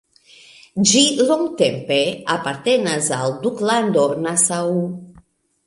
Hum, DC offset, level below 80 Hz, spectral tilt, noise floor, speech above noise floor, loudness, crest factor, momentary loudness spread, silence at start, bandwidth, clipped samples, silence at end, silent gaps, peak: none; under 0.1%; -60 dBFS; -3 dB/octave; -53 dBFS; 35 dB; -18 LUFS; 18 dB; 8 LU; 0.75 s; 11.5 kHz; under 0.1%; 0.55 s; none; -2 dBFS